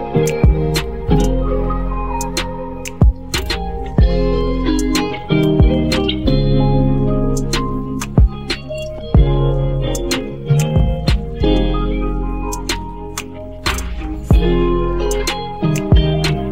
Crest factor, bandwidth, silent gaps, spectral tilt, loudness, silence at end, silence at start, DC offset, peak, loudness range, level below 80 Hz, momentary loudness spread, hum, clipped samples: 14 dB; 16 kHz; none; -6 dB/octave; -17 LUFS; 0 s; 0 s; 2%; 0 dBFS; 4 LU; -20 dBFS; 9 LU; none; under 0.1%